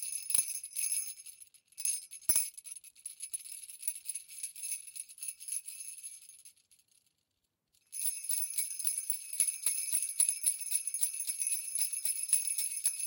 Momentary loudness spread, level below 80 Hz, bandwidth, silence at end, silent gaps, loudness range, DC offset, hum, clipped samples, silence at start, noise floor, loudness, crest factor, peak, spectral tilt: 16 LU; -78 dBFS; 17.5 kHz; 0 s; none; 11 LU; under 0.1%; none; under 0.1%; 0 s; -83 dBFS; -32 LUFS; 24 dB; -14 dBFS; 3 dB/octave